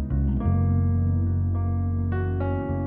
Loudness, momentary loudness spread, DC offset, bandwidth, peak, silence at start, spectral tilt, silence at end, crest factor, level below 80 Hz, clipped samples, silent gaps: -25 LUFS; 4 LU; under 0.1%; 3 kHz; -12 dBFS; 0 s; -13 dB/octave; 0 s; 10 dB; -32 dBFS; under 0.1%; none